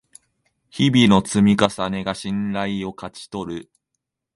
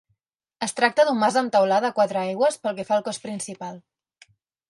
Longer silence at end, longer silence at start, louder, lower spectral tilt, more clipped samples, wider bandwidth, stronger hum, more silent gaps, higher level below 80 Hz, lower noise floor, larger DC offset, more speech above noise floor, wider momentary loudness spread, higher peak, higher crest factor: second, 0.75 s vs 0.9 s; first, 0.75 s vs 0.6 s; first, -19 LUFS vs -22 LUFS; first, -5.5 dB/octave vs -3.5 dB/octave; neither; about the same, 11.5 kHz vs 11.5 kHz; neither; neither; first, -50 dBFS vs -74 dBFS; first, -80 dBFS vs -75 dBFS; neither; first, 60 dB vs 53 dB; first, 17 LU vs 13 LU; first, 0 dBFS vs -6 dBFS; about the same, 20 dB vs 18 dB